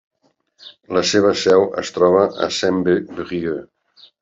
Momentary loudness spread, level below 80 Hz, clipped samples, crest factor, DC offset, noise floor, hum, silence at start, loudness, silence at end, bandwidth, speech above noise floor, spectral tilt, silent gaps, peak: 10 LU; -58 dBFS; under 0.1%; 16 dB; under 0.1%; -60 dBFS; none; 0.65 s; -17 LUFS; 0.6 s; 7.8 kHz; 43 dB; -4.5 dB/octave; none; -2 dBFS